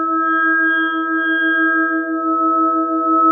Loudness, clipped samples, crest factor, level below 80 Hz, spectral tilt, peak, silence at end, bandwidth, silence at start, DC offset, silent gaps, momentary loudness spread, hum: -15 LUFS; under 0.1%; 12 dB; -90 dBFS; -6 dB/octave; -4 dBFS; 0 s; 3.4 kHz; 0 s; under 0.1%; none; 4 LU; none